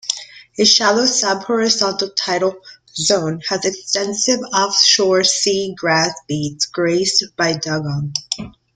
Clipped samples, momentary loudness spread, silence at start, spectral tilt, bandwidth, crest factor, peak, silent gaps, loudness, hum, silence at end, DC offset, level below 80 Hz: under 0.1%; 11 LU; 0.05 s; -2.5 dB/octave; 11 kHz; 18 dB; 0 dBFS; none; -16 LUFS; none; 0.25 s; under 0.1%; -56 dBFS